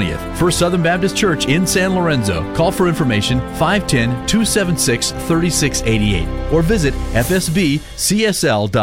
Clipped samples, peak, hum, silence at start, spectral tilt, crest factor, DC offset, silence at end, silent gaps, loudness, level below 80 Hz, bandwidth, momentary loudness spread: under 0.1%; 0 dBFS; none; 0 s; -4.5 dB/octave; 14 dB; 0.4%; 0 s; none; -16 LUFS; -28 dBFS; 16.5 kHz; 4 LU